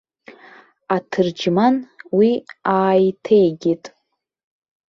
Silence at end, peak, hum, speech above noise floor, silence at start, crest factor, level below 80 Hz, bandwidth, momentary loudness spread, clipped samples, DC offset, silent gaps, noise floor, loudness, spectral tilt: 1 s; -4 dBFS; none; 56 dB; 0.9 s; 16 dB; -64 dBFS; 7.2 kHz; 8 LU; under 0.1%; under 0.1%; none; -73 dBFS; -18 LUFS; -7 dB/octave